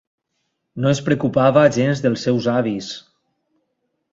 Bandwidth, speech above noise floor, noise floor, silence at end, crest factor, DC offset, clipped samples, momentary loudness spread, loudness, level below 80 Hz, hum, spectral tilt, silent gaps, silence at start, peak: 8 kHz; 56 dB; -73 dBFS; 1.15 s; 18 dB; under 0.1%; under 0.1%; 16 LU; -18 LUFS; -58 dBFS; none; -6.5 dB/octave; none; 0.75 s; -2 dBFS